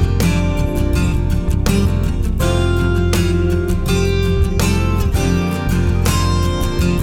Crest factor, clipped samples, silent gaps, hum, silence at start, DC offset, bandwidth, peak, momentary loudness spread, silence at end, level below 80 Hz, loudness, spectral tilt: 12 dB; under 0.1%; none; none; 0 s; 0.4%; 17 kHz; -2 dBFS; 3 LU; 0 s; -20 dBFS; -17 LUFS; -6 dB/octave